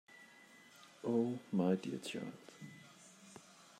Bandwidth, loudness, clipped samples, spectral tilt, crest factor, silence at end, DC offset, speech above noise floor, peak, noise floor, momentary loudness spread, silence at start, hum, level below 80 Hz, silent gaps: 15 kHz; -39 LUFS; under 0.1%; -6.5 dB/octave; 20 dB; 0.15 s; under 0.1%; 24 dB; -22 dBFS; -62 dBFS; 23 LU; 0.1 s; none; -88 dBFS; none